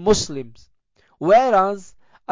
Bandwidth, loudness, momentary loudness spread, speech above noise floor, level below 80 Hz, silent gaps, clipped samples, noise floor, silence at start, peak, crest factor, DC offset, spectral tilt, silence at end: 7.6 kHz; -18 LUFS; 19 LU; 42 dB; -48 dBFS; none; under 0.1%; -60 dBFS; 0 s; -6 dBFS; 14 dB; under 0.1%; -4 dB/octave; 0 s